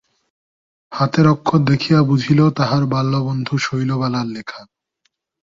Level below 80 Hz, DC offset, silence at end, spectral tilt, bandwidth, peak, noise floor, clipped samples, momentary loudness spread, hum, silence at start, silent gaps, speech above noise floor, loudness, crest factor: -52 dBFS; under 0.1%; 0.95 s; -7 dB/octave; 7.4 kHz; -2 dBFS; -68 dBFS; under 0.1%; 13 LU; none; 0.9 s; none; 52 dB; -17 LUFS; 16 dB